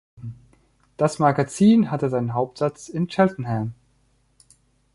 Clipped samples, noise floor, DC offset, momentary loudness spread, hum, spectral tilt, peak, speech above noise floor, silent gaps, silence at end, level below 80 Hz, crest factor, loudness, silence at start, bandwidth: under 0.1%; -63 dBFS; under 0.1%; 15 LU; none; -7 dB/octave; -4 dBFS; 43 dB; none; 1.2 s; -58 dBFS; 20 dB; -22 LUFS; 0.2 s; 11.5 kHz